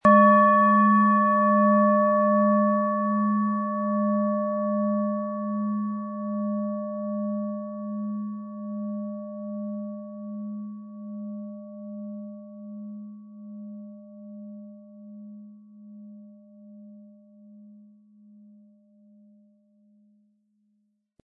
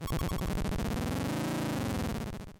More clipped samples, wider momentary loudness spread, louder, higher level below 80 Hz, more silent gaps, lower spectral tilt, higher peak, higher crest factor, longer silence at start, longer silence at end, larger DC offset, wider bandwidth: neither; first, 25 LU vs 2 LU; first, -24 LUFS vs -34 LUFS; second, -72 dBFS vs -40 dBFS; neither; first, -10.5 dB/octave vs -6 dB/octave; first, -6 dBFS vs -24 dBFS; first, 20 dB vs 8 dB; about the same, 0.05 s vs 0 s; first, 3.5 s vs 0 s; neither; second, 3.5 kHz vs 17 kHz